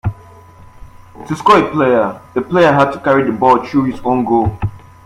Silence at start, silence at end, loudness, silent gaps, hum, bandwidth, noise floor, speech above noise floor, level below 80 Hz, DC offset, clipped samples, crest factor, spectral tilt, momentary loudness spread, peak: 0.05 s; 0.25 s; -13 LUFS; none; none; 14.5 kHz; -39 dBFS; 26 dB; -40 dBFS; under 0.1%; under 0.1%; 14 dB; -7 dB/octave; 12 LU; 0 dBFS